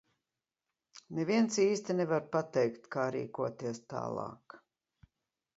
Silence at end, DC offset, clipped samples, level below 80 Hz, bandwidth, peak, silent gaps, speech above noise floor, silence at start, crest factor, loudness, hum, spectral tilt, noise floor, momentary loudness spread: 1 s; under 0.1%; under 0.1%; -78 dBFS; 8 kHz; -16 dBFS; none; over 57 dB; 0.95 s; 18 dB; -34 LUFS; none; -5.5 dB/octave; under -90 dBFS; 12 LU